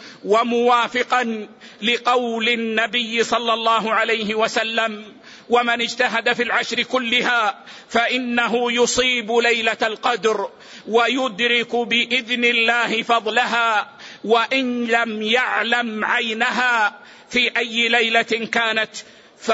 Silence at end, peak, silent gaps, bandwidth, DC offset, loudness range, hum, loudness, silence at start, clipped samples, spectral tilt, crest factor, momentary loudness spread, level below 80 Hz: 0 s; -4 dBFS; none; 8 kHz; under 0.1%; 1 LU; none; -18 LUFS; 0 s; under 0.1%; -2.5 dB/octave; 14 dB; 6 LU; -62 dBFS